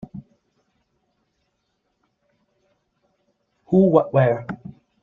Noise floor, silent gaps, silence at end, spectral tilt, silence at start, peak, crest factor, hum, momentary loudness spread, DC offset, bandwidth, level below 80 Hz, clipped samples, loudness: -73 dBFS; none; 0.5 s; -10.5 dB/octave; 0.15 s; -2 dBFS; 22 dB; none; 25 LU; under 0.1%; 3.9 kHz; -62 dBFS; under 0.1%; -18 LUFS